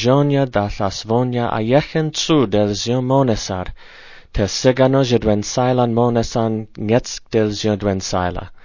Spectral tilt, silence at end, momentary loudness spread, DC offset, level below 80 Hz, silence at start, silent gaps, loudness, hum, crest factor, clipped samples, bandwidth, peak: -5.5 dB/octave; 0.05 s; 7 LU; under 0.1%; -38 dBFS; 0 s; none; -18 LUFS; none; 16 dB; under 0.1%; 7.4 kHz; 0 dBFS